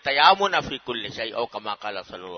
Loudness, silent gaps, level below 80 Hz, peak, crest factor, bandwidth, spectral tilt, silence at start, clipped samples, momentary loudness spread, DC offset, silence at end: -23 LUFS; none; -58 dBFS; 0 dBFS; 24 dB; 6.6 kHz; -3 dB/octave; 0.05 s; under 0.1%; 15 LU; under 0.1%; 0 s